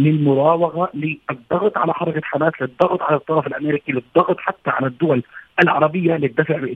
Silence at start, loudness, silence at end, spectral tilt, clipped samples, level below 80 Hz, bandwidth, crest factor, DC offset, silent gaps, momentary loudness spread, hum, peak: 0 s; -19 LUFS; 0 s; -9 dB/octave; under 0.1%; -60 dBFS; 5.6 kHz; 18 dB; under 0.1%; none; 7 LU; none; 0 dBFS